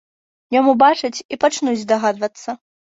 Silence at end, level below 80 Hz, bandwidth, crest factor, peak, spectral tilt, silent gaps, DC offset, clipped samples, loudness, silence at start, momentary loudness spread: 0.4 s; -66 dBFS; 8 kHz; 16 dB; -2 dBFS; -3.5 dB/octave; 1.25-1.29 s; under 0.1%; under 0.1%; -17 LUFS; 0.5 s; 16 LU